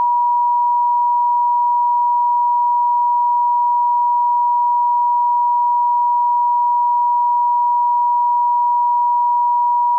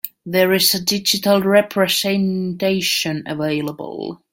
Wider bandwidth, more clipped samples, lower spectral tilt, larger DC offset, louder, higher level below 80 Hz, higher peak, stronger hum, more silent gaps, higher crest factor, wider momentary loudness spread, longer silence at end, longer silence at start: second, 1.1 kHz vs 17 kHz; neither; second, 8.5 dB/octave vs -3.5 dB/octave; neither; about the same, -15 LUFS vs -17 LUFS; second, under -90 dBFS vs -58 dBFS; second, -12 dBFS vs -2 dBFS; neither; neither; second, 4 dB vs 16 dB; second, 0 LU vs 10 LU; second, 0 s vs 0.15 s; about the same, 0 s vs 0.05 s